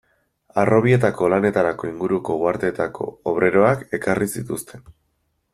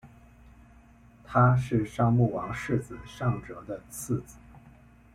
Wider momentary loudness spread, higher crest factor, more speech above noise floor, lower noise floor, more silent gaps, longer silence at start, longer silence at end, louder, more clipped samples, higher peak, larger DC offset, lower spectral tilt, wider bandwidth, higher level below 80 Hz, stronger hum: second, 11 LU vs 17 LU; about the same, 18 dB vs 20 dB; first, 50 dB vs 28 dB; first, -70 dBFS vs -55 dBFS; neither; second, 0.55 s vs 1.3 s; about the same, 0.6 s vs 0.55 s; first, -20 LUFS vs -28 LUFS; neither; first, -2 dBFS vs -10 dBFS; neither; about the same, -7 dB/octave vs -7.5 dB/octave; about the same, 14.5 kHz vs 14.5 kHz; about the same, -54 dBFS vs -52 dBFS; neither